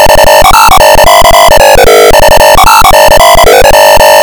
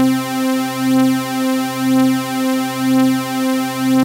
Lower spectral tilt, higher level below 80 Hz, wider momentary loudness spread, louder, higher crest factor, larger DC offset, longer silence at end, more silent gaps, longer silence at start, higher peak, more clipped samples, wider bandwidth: second, -2 dB/octave vs -4.5 dB/octave; first, -12 dBFS vs -62 dBFS; second, 1 LU vs 4 LU; first, -1 LUFS vs -16 LUFS; second, 0 dB vs 8 dB; first, 5% vs under 0.1%; about the same, 0 s vs 0 s; neither; about the same, 0 s vs 0 s; first, 0 dBFS vs -6 dBFS; first, 50% vs under 0.1%; first, over 20 kHz vs 16 kHz